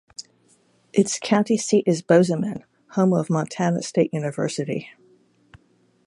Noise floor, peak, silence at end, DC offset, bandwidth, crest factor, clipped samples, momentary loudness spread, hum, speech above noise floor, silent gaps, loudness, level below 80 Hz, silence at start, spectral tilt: -62 dBFS; -4 dBFS; 1.15 s; under 0.1%; 11.5 kHz; 20 dB; under 0.1%; 12 LU; none; 41 dB; none; -22 LUFS; -66 dBFS; 0.2 s; -5.5 dB/octave